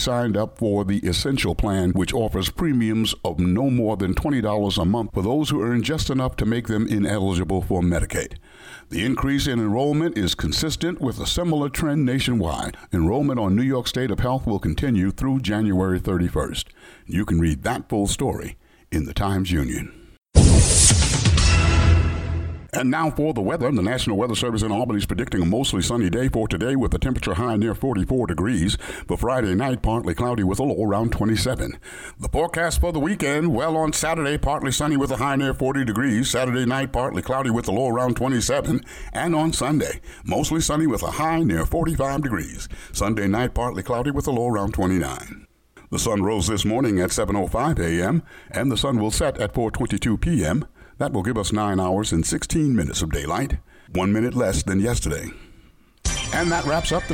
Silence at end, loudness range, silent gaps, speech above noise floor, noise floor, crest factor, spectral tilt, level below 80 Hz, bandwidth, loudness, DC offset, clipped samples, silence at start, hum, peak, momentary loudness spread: 0 s; 5 LU; none; 30 dB; -52 dBFS; 20 dB; -5 dB/octave; -32 dBFS; 17.5 kHz; -22 LUFS; under 0.1%; under 0.1%; 0 s; none; 0 dBFS; 6 LU